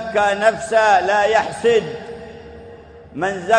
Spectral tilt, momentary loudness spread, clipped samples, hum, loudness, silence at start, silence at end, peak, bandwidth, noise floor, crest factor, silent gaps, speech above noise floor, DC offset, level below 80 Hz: -3.5 dB/octave; 21 LU; under 0.1%; none; -17 LUFS; 0 s; 0 s; 0 dBFS; 9.8 kHz; -40 dBFS; 18 dB; none; 23 dB; under 0.1%; -50 dBFS